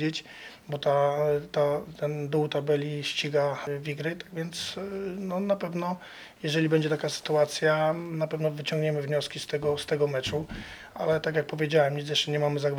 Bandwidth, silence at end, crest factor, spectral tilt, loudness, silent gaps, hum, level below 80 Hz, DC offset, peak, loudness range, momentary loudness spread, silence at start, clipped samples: 18.5 kHz; 0 s; 18 dB; -5 dB/octave; -28 LUFS; none; none; -60 dBFS; under 0.1%; -10 dBFS; 3 LU; 10 LU; 0 s; under 0.1%